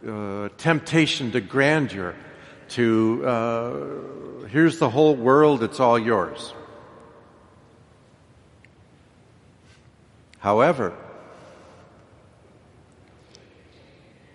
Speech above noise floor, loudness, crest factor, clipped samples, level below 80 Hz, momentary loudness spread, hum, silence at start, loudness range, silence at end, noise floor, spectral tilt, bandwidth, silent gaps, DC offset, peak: 33 dB; -21 LUFS; 22 dB; under 0.1%; -62 dBFS; 19 LU; none; 0.05 s; 8 LU; 3.15 s; -54 dBFS; -6 dB/octave; 11.5 kHz; none; under 0.1%; -2 dBFS